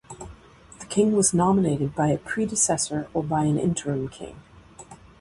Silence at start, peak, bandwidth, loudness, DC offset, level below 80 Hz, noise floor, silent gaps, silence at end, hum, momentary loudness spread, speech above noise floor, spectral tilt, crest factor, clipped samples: 0.1 s; -8 dBFS; 11.5 kHz; -23 LUFS; under 0.1%; -52 dBFS; -48 dBFS; none; 0.25 s; none; 22 LU; 25 dB; -5 dB/octave; 16 dB; under 0.1%